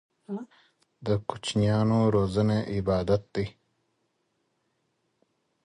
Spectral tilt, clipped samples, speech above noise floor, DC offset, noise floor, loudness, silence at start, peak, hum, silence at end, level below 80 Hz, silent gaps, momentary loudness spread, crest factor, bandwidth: -7 dB/octave; under 0.1%; 49 dB; under 0.1%; -75 dBFS; -27 LUFS; 0.3 s; -10 dBFS; none; 2.15 s; -50 dBFS; none; 15 LU; 18 dB; 10.5 kHz